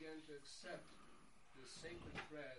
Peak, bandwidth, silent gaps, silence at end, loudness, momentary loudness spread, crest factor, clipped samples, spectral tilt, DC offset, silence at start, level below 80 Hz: -38 dBFS; 11.5 kHz; none; 0 s; -55 LUFS; 14 LU; 20 dB; under 0.1%; -3.5 dB/octave; under 0.1%; 0 s; -72 dBFS